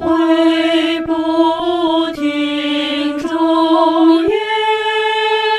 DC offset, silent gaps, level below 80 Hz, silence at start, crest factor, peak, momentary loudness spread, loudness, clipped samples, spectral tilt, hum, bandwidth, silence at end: under 0.1%; none; -50 dBFS; 0 s; 12 dB; 0 dBFS; 6 LU; -14 LUFS; under 0.1%; -4 dB/octave; none; 11 kHz; 0 s